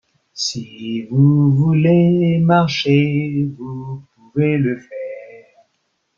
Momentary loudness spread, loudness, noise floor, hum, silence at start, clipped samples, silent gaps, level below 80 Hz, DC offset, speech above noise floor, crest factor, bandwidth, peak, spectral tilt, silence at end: 17 LU; -16 LUFS; -68 dBFS; none; 0.35 s; under 0.1%; none; -56 dBFS; under 0.1%; 53 dB; 14 dB; 7.4 kHz; -2 dBFS; -7 dB/octave; 0.8 s